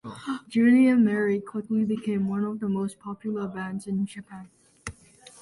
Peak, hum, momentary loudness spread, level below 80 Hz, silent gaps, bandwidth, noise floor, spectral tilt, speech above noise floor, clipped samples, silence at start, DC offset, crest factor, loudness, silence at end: -12 dBFS; none; 22 LU; -60 dBFS; none; 11.5 kHz; -52 dBFS; -7 dB/octave; 28 dB; under 0.1%; 0.05 s; under 0.1%; 14 dB; -25 LUFS; 0.5 s